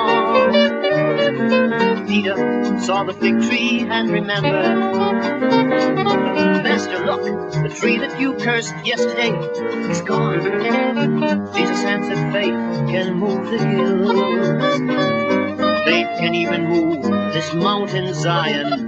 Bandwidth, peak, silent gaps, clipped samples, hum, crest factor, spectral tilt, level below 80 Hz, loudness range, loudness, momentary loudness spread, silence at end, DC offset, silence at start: 8 kHz; -2 dBFS; none; under 0.1%; none; 16 dB; -5.5 dB/octave; -58 dBFS; 2 LU; -18 LUFS; 5 LU; 0 s; under 0.1%; 0 s